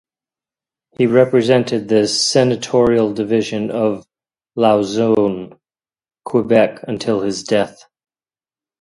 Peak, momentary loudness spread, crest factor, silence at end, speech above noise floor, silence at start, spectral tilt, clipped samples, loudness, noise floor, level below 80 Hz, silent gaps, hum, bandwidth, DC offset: 0 dBFS; 9 LU; 18 dB; 1.1 s; over 75 dB; 1 s; -5 dB/octave; under 0.1%; -16 LUFS; under -90 dBFS; -54 dBFS; none; none; 11.5 kHz; under 0.1%